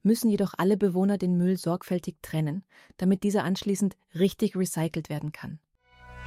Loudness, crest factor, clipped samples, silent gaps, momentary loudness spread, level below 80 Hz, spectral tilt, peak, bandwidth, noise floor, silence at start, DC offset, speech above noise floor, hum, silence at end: -27 LUFS; 16 dB; under 0.1%; none; 10 LU; -60 dBFS; -6.5 dB/octave; -10 dBFS; 15.5 kHz; -52 dBFS; 0.05 s; under 0.1%; 26 dB; none; 0 s